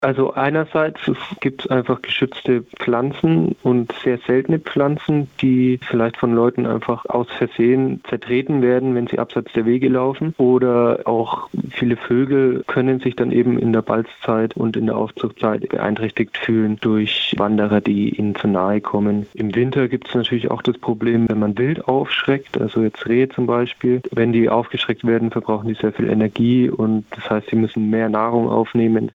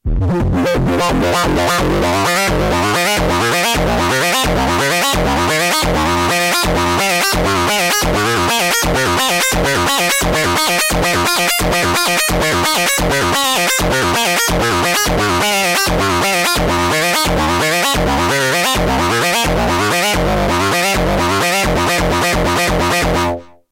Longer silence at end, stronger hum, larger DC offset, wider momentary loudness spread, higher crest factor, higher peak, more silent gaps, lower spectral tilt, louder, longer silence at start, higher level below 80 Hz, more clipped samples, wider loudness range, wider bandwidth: second, 0.05 s vs 0.25 s; neither; neither; first, 5 LU vs 2 LU; first, 16 dB vs 10 dB; about the same, -2 dBFS vs -4 dBFS; neither; first, -8.5 dB/octave vs -3 dB/octave; second, -19 LUFS vs -13 LUFS; about the same, 0 s vs 0.05 s; second, -56 dBFS vs -26 dBFS; neither; about the same, 2 LU vs 1 LU; second, 7 kHz vs 16 kHz